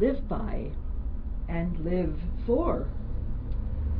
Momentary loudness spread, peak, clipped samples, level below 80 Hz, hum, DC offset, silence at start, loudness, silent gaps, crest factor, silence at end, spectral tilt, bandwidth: 9 LU; -12 dBFS; under 0.1%; -32 dBFS; none; under 0.1%; 0 s; -32 LUFS; none; 16 dB; 0 s; -12 dB/octave; 4.5 kHz